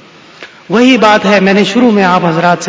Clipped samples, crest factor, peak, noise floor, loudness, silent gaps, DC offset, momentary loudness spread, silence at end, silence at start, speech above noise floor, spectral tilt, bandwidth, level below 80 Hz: 0.7%; 8 dB; 0 dBFS; -34 dBFS; -8 LUFS; none; under 0.1%; 3 LU; 0 s; 0.4 s; 26 dB; -5.5 dB/octave; 8 kHz; -50 dBFS